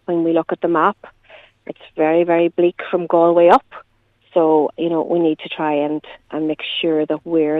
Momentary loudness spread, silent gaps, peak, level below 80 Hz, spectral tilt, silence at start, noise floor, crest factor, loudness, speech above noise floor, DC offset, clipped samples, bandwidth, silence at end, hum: 13 LU; none; 0 dBFS; -62 dBFS; -7.5 dB/octave; 0.1 s; -56 dBFS; 18 dB; -17 LUFS; 40 dB; under 0.1%; under 0.1%; 4.8 kHz; 0 s; none